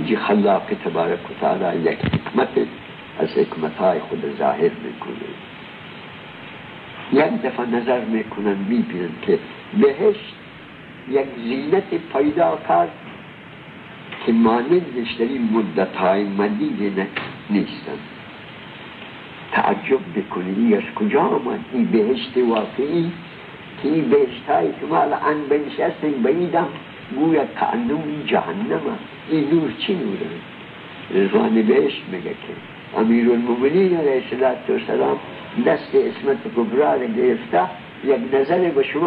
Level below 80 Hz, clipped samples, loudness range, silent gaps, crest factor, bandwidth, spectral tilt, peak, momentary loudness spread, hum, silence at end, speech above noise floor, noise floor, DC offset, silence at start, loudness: -58 dBFS; under 0.1%; 4 LU; none; 16 dB; 5 kHz; -9.5 dB/octave; -4 dBFS; 19 LU; none; 0 s; 20 dB; -39 dBFS; under 0.1%; 0 s; -20 LUFS